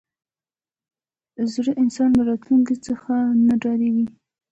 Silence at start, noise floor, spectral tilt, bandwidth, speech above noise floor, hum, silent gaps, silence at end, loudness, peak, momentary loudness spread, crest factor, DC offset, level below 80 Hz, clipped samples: 1.4 s; under -90 dBFS; -6.5 dB/octave; 8.2 kHz; over 71 dB; none; none; 0.45 s; -20 LUFS; -8 dBFS; 8 LU; 12 dB; under 0.1%; -54 dBFS; under 0.1%